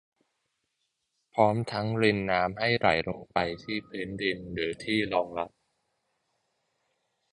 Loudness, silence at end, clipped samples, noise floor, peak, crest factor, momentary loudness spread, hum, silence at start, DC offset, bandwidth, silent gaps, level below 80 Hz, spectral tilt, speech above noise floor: -28 LUFS; 1.85 s; under 0.1%; -80 dBFS; -6 dBFS; 24 dB; 10 LU; none; 1.35 s; under 0.1%; 10.5 kHz; none; -58 dBFS; -6 dB/octave; 51 dB